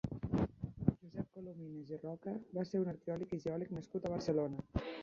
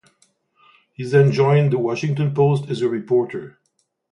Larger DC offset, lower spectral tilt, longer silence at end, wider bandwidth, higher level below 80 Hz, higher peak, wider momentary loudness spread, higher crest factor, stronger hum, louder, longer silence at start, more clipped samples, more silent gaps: neither; about the same, -8 dB/octave vs -8 dB/octave; second, 0 s vs 0.65 s; second, 7.4 kHz vs 10 kHz; first, -56 dBFS vs -62 dBFS; second, -16 dBFS vs -4 dBFS; about the same, 10 LU vs 10 LU; first, 24 dB vs 16 dB; neither; second, -41 LUFS vs -19 LUFS; second, 0.05 s vs 1 s; neither; neither